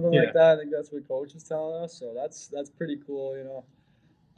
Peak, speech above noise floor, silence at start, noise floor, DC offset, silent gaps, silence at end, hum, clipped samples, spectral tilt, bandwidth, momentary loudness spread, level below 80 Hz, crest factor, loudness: -8 dBFS; 37 dB; 0 s; -63 dBFS; under 0.1%; none; 0.75 s; none; under 0.1%; -6 dB/octave; 9.2 kHz; 18 LU; -72 dBFS; 20 dB; -27 LUFS